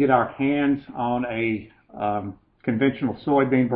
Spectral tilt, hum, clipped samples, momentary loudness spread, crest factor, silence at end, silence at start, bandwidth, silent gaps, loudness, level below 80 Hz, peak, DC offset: -11.5 dB/octave; none; under 0.1%; 11 LU; 18 dB; 0 s; 0 s; 4.4 kHz; none; -24 LUFS; -56 dBFS; -4 dBFS; under 0.1%